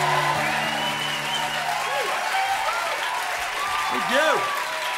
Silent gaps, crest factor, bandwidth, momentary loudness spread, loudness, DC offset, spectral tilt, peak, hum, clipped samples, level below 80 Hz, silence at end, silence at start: none; 16 dB; 16 kHz; 5 LU; -23 LUFS; under 0.1%; -2 dB/octave; -8 dBFS; none; under 0.1%; -60 dBFS; 0 s; 0 s